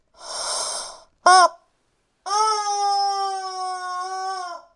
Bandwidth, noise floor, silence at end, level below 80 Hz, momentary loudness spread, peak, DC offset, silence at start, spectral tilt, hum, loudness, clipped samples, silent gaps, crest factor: 11 kHz; -68 dBFS; 0.15 s; -68 dBFS; 16 LU; 0 dBFS; under 0.1%; 0.2 s; 1 dB/octave; none; -21 LUFS; under 0.1%; none; 22 dB